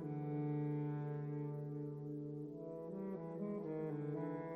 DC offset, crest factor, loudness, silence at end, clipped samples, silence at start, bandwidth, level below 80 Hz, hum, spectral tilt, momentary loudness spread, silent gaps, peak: under 0.1%; 12 dB; -44 LUFS; 0 s; under 0.1%; 0 s; 3.7 kHz; -78 dBFS; none; -11.5 dB/octave; 7 LU; none; -32 dBFS